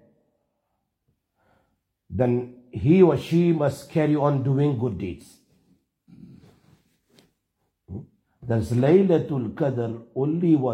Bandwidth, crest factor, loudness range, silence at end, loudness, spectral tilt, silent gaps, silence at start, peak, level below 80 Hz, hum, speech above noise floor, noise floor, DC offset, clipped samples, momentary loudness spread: 12.5 kHz; 20 dB; 10 LU; 0 s; -22 LUFS; -9 dB/octave; none; 2.1 s; -4 dBFS; -58 dBFS; none; 55 dB; -77 dBFS; under 0.1%; under 0.1%; 19 LU